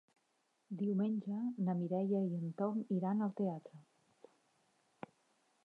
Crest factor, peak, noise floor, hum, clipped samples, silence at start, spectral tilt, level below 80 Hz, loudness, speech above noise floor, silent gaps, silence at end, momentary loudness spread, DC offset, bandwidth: 14 dB; -26 dBFS; -80 dBFS; none; under 0.1%; 0.7 s; -10.5 dB/octave; under -90 dBFS; -38 LUFS; 43 dB; none; 1.85 s; 17 LU; under 0.1%; 3.8 kHz